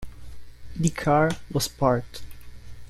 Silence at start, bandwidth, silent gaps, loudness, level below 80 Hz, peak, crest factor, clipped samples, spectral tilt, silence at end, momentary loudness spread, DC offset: 0 s; 15 kHz; none; -24 LUFS; -44 dBFS; -6 dBFS; 20 dB; under 0.1%; -5.5 dB/octave; 0.05 s; 20 LU; under 0.1%